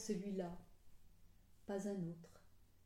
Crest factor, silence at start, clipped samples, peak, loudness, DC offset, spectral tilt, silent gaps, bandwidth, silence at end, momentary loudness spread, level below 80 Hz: 18 dB; 0 s; under 0.1%; -30 dBFS; -46 LUFS; under 0.1%; -6.5 dB/octave; none; 16.5 kHz; 0 s; 16 LU; -70 dBFS